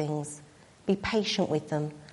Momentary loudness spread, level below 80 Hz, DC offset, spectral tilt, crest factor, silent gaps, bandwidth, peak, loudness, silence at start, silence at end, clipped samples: 12 LU; -58 dBFS; under 0.1%; -5 dB/octave; 16 dB; none; 11.5 kHz; -14 dBFS; -30 LUFS; 0 s; 0 s; under 0.1%